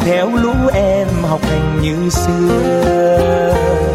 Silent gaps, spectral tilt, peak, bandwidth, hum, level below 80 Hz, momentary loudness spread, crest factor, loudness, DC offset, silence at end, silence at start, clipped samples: none; -6.5 dB/octave; -2 dBFS; 16 kHz; none; -26 dBFS; 4 LU; 10 dB; -14 LUFS; under 0.1%; 0 s; 0 s; under 0.1%